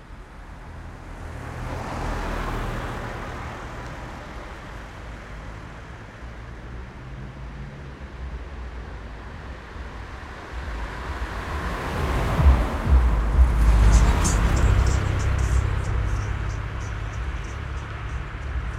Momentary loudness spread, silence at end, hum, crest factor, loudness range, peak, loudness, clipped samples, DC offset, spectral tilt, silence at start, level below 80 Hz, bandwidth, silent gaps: 19 LU; 0 s; none; 20 dB; 17 LU; -4 dBFS; -25 LUFS; under 0.1%; under 0.1%; -5.5 dB/octave; 0 s; -26 dBFS; 12 kHz; none